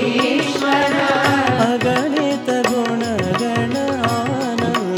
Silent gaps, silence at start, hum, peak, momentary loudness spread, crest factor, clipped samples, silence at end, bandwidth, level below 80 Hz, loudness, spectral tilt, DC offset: none; 0 s; none; -2 dBFS; 4 LU; 16 dB; under 0.1%; 0 s; 18.5 kHz; -56 dBFS; -17 LUFS; -5 dB/octave; under 0.1%